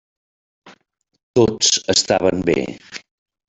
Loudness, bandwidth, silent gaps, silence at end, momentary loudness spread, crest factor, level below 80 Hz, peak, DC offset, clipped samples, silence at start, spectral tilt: -17 LUFS; 8.4 kHz; 1.23-1.34 s; 0.5 s; 20 LU; 18 dB; -52 dBFS; -2 dBFS; under 0.1%; under 0.1%; 0.65 s; -3 dB/octave